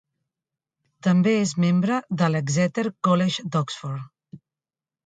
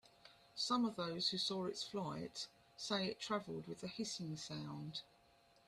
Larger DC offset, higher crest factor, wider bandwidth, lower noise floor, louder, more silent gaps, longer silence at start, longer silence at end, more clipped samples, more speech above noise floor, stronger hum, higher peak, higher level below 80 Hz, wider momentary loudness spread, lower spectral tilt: neither; about the same, 18 dB vs 20 dB; second, 9.2 kHz vs 13.5 kHz; first, under -90 dBFS vs -71 dBFS; first, -23 LUFS vs -43 LUFS; neither; first, 1.05 s vs 0.05 s; about the same, 0.7 s vs 0.65 s; neither; first, over 68 dB vs 28 dB; neither; first, -6 dBFS vs -24 dBFS; first, -66 dBFS vs -78 dBFS; about the same, 11 LU vs 11 LU; first, -6 dB/octave vs -4 dB/octave